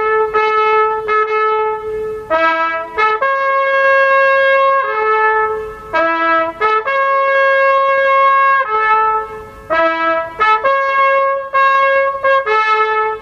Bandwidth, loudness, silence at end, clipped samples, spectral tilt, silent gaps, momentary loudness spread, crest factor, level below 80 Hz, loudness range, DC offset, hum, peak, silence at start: 7 kHz; -13 LUFS; 0 s; under 0.1%; -4 dB/octave; none; 7 LU; 12 dB; -50 dBFS; 2 LU; under 0.1%; none; -2 dBFS; 0 s